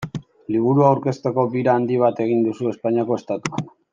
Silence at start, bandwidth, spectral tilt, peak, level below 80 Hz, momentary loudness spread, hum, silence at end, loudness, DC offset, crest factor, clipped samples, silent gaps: 0 s; 9.4 kHz; -8 dB/octave; -2 dBFS; -62 dBFS; 11 LU; none; 0.25 s; -20 LUFS; under 0.1%; 18 dB; under 0.1%; none